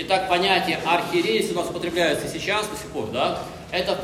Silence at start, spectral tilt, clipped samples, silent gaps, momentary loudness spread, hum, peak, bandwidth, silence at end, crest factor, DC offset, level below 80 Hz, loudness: 0 s; -3.5 dB/octave; under 0.1%; none; 9 LU; none; -4 dBFS; 16 kHz; 0 s; 18 dB; under 0.1%; -52 dBFS; -23 LUFS